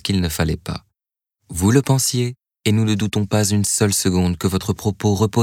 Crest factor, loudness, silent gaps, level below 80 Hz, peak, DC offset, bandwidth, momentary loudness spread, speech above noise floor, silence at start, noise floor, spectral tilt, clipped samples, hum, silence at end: 18 dB; -19 LUFS; none; -44 dBFS; -2 dBFS; under 0.1%; 17.5 kHz; 9 LU; 67 dB; 0.05 s; -85 dBFS; -5 dB/octave; under 0.1%; none; 0 s